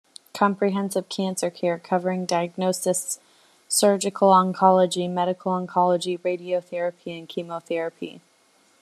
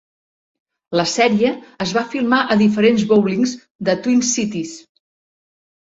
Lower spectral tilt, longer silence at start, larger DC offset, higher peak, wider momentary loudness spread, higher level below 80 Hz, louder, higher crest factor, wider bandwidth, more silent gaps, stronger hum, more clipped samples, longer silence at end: about the same, -4.5 dB/octave vs -4.5 dB/octave; second, 0.35 s vs 0.9 s; neither; about the same, -4 dBFS vs -2 dBFS; first, 14 LU vs 10 LU; second, -74 dBFS vs -58 dBFS; second, -23 LUFS vs -17 LUFS; about the same, 20 dB vs 16 dB; first, 14 kHz vs 8 kHz; second, none vs 3.71-3.79 s; neither; neither; second, 0.65 s vs 1.15 s